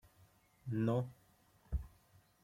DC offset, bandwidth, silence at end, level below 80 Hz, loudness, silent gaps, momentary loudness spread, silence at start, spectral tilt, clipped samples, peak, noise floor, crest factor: under 0.1%; 15.5 kHz; 0.55 s; -52 dBFS; -40 LUFS; none; 16 LU; 0.65 s; -9 dB/octave; under 0.1%; -24 dBFS; -70 dBFS; 20 dB